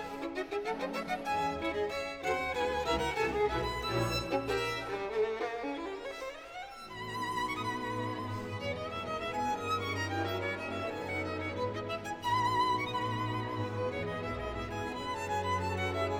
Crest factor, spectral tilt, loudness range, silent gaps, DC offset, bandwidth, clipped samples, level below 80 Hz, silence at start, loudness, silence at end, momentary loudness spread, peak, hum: 16 dB; -5 dB/octave; 4 LU; none; under 0.1%; 19.5 kHz; under 0.1%; -54 dBFS; 0 s; -35 LUFS; 0 s; 7 LU; -18 dBFS; none